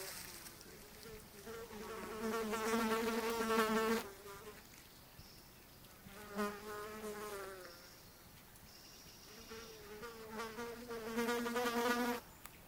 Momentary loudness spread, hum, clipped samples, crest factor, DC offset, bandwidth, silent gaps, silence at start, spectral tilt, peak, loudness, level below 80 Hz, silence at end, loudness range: 21 LU; none; under 0.1%; 24 dB; under 0.1%; 16 kHz; none; 0 s; -3.5 dB/octave; -20 dBFS; -41 LUFS; -66 dBFS; 0 s; 12 LU